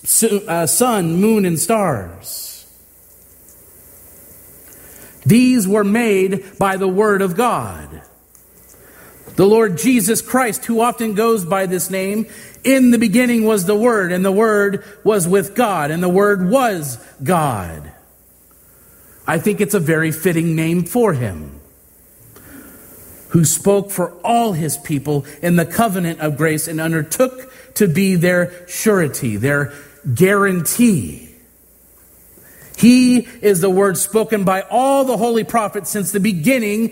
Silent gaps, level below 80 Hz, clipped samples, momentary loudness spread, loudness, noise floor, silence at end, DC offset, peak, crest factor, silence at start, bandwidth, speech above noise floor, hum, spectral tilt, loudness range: none; -50 dBFS; under 0.1%; 11 LU; -16 LUFS; -49 dBFS; 0 s; under 0.1%; 0 dBFS; 16 dB; 0.05 s; 16.5 kHz; 34 dB; none; -5 dB/octave; 5 LU